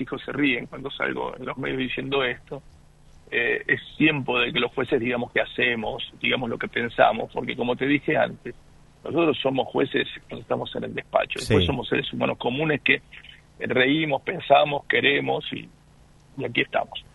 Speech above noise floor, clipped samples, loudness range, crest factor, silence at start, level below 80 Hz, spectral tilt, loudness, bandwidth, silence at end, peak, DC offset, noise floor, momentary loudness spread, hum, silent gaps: 29 dB; under 0.1%; 4 LU; 22 dB; 0 s; -50 dBFS; -6 dB/octave; -24 LUFS; 11.5 kHz; 0.15 s; -2 dBFS; under 0.1%; -54 dBFS; 11 LU; none; none